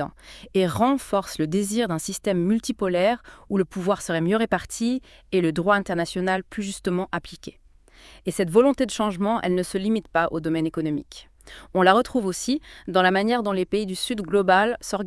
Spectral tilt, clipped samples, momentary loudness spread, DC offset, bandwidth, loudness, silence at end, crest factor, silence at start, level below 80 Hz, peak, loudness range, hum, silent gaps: -5 dB/octave; under 0.1%; 10 LU; under 0.1%; 12 kHz; -23 LUFS; 0 s; 22 dB; 0 s; -52 dBFS; -2 dBFS; 3 LU; none; none